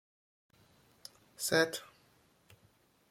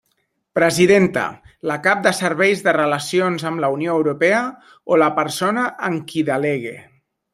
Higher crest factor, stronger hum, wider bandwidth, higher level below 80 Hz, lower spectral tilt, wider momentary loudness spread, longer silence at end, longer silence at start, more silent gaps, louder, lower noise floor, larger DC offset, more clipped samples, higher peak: first, 26 dB vs 18 dB; neither; about the same, 16.5 kHz vs 15.5 kHz; second, -76 dBFS vs -60 dBFS; second, -2.5 dB/octave vs -5 dB/octave; first, 24 LU vs 11 LU; first, 1.25 s vs 0.55 s; first, 1.4 s vs 0.55 s; neither; second, -33 LUFS vs -18 LUFS; about the same, -69 dBFS vs -69 dBFS; neither; neither; second, -14 dBFS vs -2 dBFS